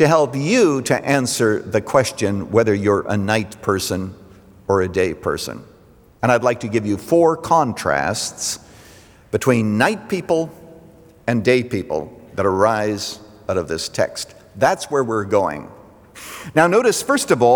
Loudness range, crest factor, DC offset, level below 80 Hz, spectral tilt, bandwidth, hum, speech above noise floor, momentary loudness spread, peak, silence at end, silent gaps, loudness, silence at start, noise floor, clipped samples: 3 LU; 18 dB; under 0.1%; -54 dBFS; -5 dB/octave; over 20 kHz; none; 31 dB; 12 LU; -2 dBFS; 0 s; none; -19 LUFS; 0 s; -49 dBFS; under 0.1%